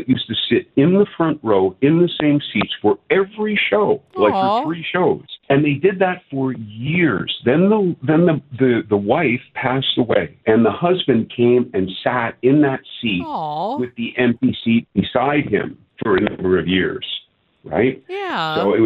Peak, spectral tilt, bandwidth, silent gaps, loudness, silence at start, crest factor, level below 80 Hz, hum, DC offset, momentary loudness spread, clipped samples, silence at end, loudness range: 0 dBFS; -9 dB/octave; 5.2 kHz; none; -18 LUFS; 0 s; 16 dB; -54 dBFS; none; under 0.1%; 8 LU; under 0.1%; 0 s; 3 LU